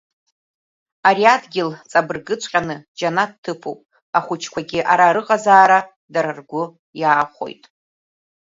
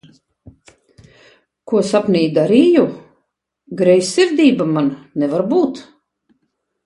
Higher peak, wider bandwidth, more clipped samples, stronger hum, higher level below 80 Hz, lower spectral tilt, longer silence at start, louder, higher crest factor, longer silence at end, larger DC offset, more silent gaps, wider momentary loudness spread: about the same, 0 dBFS vs 0 dBFS; second, 7.8 kHz vs 11.5 kHz; neither; neither; about the same, -64 dBFS vs -60 dBFS; second, -4 dB/octave vs -6 dB/octave; second, 1.05 s vs 1.65 s; second, -18 LUFS vs -15 LUFS; about the same, 18 dB vs 16 dB; second, 0.9 s vs 1.05 s; neither; first, 2.88-2.95 s, 3.38-3.43 s, 4.02-4.13 s, 5.96-6.08 s, 6.79-6.93 s vs none; first, 15 LU vs 9 LU